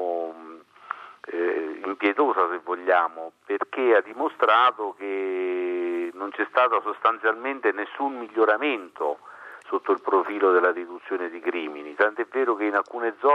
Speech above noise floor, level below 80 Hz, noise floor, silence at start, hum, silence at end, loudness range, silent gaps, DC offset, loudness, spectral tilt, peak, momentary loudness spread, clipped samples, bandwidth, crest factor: 21 dB; -88 dBFS; -45 dBFS; 0 s; none; 0 s; 3 LU; none; under 0.1%; -24 LUFS; -4.5 dB/octave; -6 dBFS; 11 LU; under 0.1%; 6 kHz; 20 dB